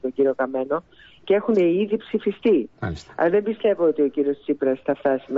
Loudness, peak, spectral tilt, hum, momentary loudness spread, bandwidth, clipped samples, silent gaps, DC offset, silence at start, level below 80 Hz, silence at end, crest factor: -22 LUFS; -8 dBFS; -8 dB/octave; none; 7 LU; 7.6 kHz; under 0.1%; none; under 0.1%; 0 s; -54 dBFS; 0 s; 14 dB